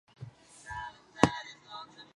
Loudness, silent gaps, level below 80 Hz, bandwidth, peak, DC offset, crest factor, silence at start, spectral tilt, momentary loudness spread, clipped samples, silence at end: -32 LUFS; none; -58 dBFS; 11.5 kHz; -2 dBFS; under 0.1%; 34 dB; 0.2 s; -5 dB/octave; 22 LU; under 0.1%; 0.1 s